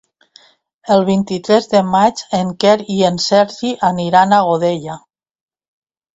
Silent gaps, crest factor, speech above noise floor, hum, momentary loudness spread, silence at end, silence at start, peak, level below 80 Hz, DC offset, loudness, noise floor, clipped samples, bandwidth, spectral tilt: none; 16 dB; 35 dB; none; 7 LU; 1.15 s; 0.85 s; 0 dBFS; -56 dBFS; under 0.1%; -14 LUFS; -49 dBFS; under 0.1%; 8 kHz; -5.5 dB/octave